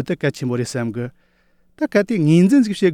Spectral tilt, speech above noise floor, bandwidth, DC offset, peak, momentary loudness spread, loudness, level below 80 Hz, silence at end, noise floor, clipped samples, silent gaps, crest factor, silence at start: -7 dB/octave; 41 dB; 14.5 kHz; under 0.1%; -2 dBFS; 13 LU; -18 LUFS; -60 dBFS; 0 s; -58 dBFS; under 0.1%; none; 16 dB; 0 s